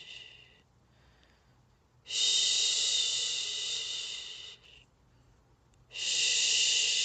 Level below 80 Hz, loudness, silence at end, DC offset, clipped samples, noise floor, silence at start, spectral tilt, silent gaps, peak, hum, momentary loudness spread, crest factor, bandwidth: -70 dBFS; -28 LUFS; 0 s; under 0.1%; under 0.1%; -66 dBFS; 0 s; 3 dB/octave; none; -16 dBFS; none; 20 LU; 18 dB; 9.4 kHz